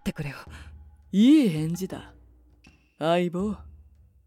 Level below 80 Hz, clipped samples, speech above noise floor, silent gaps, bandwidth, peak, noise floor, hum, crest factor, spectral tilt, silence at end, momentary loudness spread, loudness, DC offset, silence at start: -52 dBFS; under 0.1%; 34 dB; none; 15 kHz; -10 dBFS; -57 dBFS; none; 16 dB; -6.5 dB/octave; 0.55 s; 23 LU; -24 LUFS; under 0.1%; 0.05 s